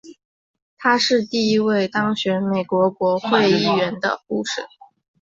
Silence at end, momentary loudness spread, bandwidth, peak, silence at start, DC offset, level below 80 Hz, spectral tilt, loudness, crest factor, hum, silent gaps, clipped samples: 0.55 s; 8 LU; 7.8 kHz; -4 dBFS; 0.05 s; under 0.1%; -62 dBFS; -5 dB/octave; -19 LUFS; 16 dB; none; 0.25-0.54 s, 0.62-0.77 s; under 0.1%